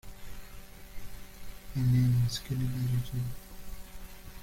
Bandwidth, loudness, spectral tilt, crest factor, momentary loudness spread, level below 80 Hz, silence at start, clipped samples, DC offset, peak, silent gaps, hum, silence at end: 16.5 kHz; -31 LUFS; -6.5 dB/octave; 14 dB; 23 LU; -46 dBFS; 0.05 s; under 0.1%; under 0.1%; -18 dBFS; none; none; 0 s